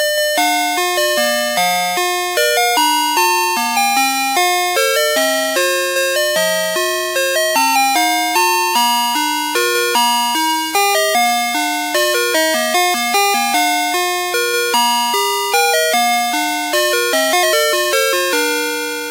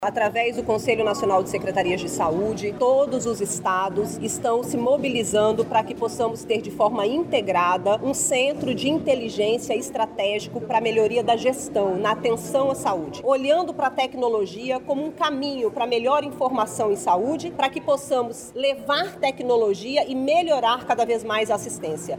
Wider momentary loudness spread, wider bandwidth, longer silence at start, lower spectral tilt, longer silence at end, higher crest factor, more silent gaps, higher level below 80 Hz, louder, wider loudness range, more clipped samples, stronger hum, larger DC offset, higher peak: about the same, 3 LU vs 5 LU; about the same, 16 kHz vs 17.5 kHz; about the same, 0 s vs 0 s; second, 0 dB/octave vs -4 dB/octave; about the same, 0 s vs 0 s; about the same, 16 dB vs 16 dB; neither; second, -80 dBFS vs -56 dBFS; first, -14 LUFS vs -23 LUFS; about the same, 1 LU vs 1 LU; neither; neither; neither; first, 0 dBFS vs -8 dBFS